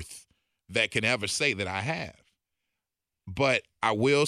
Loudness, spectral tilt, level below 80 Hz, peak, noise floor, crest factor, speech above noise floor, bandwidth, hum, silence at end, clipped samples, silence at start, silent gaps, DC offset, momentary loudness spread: -27 LUFS; -4 dB/octave; -60 dBFS; -10 dBFS; -87 dBFS; 20 dB; 60 dB; 14 kHz; none; 0 s; under 0.1%; 0 s; none; under 0.1%; 16 LU